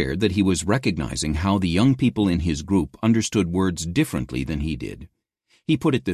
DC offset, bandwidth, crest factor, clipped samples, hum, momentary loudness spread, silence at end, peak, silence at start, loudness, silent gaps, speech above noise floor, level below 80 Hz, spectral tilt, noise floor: under 0.1%; 14 kHz; 16 dB; under 0.1%; none; 8 LU; 0 s; -6 dBFS; 0 s; -22 LUFS; none; 43 dB; -36 dBFS; -5.5 dB/octave; -65 dBFS